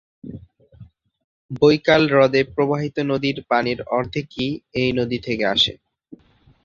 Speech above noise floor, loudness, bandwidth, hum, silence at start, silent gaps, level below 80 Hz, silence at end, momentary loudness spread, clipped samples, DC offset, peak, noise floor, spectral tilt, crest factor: 35 dB; -19 LUFS; 7.4 kHz; none; 0.25 s; 1.24-1.49 s; -52 dBFS; 0.9 s; 11 LU; under 0.1%; under 0.1%; -2 dBFS; -54 dBFS; -6 dB/octave; 20 dB